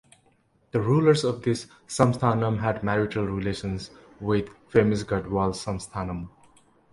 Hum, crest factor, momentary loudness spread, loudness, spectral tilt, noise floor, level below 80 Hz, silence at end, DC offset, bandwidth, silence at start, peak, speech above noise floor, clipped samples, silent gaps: none; 20 dB; 13 LU; -26 LUFS; -6.5 dB/octave; -64 dBFS; -48 dBFS; 0.65 s; under 0.1%; 11.5 kHz; 0.75 s; -4 dBFS; 39 dB; under 0.1%; none